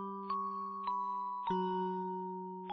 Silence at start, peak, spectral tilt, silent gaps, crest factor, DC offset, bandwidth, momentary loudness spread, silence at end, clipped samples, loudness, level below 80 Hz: 0 s; -24 dBFS; -6 dB/octave; none; 14 dB; under 0.1%; 6.2 kHz; 6 LU; 0 s; under 0.1%; -38 LUFS; -76 dBFS